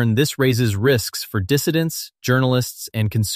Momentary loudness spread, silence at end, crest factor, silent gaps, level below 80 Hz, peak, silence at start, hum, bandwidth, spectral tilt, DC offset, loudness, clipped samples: 7 LU; 0 s; 14 dB; none; -50 dBFS; -4 dBFS; 0 s; none; 15 kHz; -5 dB/octave; under 0.1%; -20 LUFS; under 0.1%